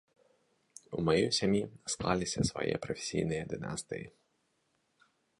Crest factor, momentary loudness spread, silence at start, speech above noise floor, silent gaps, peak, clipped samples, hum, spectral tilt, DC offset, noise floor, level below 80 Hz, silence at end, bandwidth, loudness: 22 dB; 13 LU; 0.9 s; 44 dB; none; -14 dBFS; under 0.1%; none; -4.5 dB/octave; under 0.1%; -77 dBFS; -58 dBFS; 1.3 s; 11.5 kHz; -33 LUFS